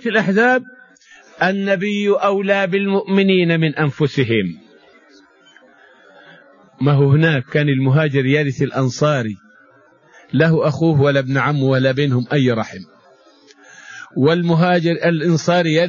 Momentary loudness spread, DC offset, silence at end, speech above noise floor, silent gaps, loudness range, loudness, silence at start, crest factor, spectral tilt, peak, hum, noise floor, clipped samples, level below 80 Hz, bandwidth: 6 LU; under 0.1%; 0 s; 35 dB; none; 4 LU; -16 LUFS; 0 s; 16 dB; -7 dB/octave; -2 dBFS; none; -51 dBFS; under 0.1%; -56 dBFS; 7.4 kHz